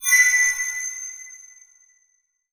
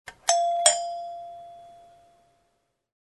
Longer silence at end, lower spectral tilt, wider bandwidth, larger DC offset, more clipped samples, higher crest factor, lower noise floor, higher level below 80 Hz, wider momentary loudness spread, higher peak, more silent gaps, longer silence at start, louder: second, 1.15 s vs 1.3 s; second, 6 dB/octave vs 2.5 dB/octave; first, over 20 kHz vs 12.5 kHz; neither; neither; second, 20 dB vs 26 dB; second, -68 dBFS vs -73 dBFS; about the same, -68 dBFS vs -70 dBFS; about the same, 23 LU vs 24 LU; about the same, -4 dBFS vs -4 dBFS; neither; about the same, 0 s vs 0.05 s; first, -18 LUFS vs -23 LUFS